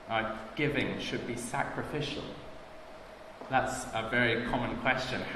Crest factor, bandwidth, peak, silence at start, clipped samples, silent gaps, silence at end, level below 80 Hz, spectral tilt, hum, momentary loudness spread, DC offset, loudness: 22 dB; 14 kHz; -10 dBFS; 0 s; under 0.1%; none; 0 s; -54 dBFS; -4.5 dB/octave; none; 20 LU; under 0.1%; -32 LUFS